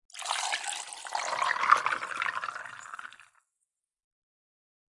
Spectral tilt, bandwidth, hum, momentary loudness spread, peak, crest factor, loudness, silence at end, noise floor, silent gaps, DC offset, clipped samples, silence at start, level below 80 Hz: 1 dB/octave; 11.5 kHz; none; 18 LU; -4 dBFS; 28 dB; -30 LUFS; 1.7 s; -84 dBFS; none; under 0.1%; under 0.1%; 0.15 s; -82 dBFS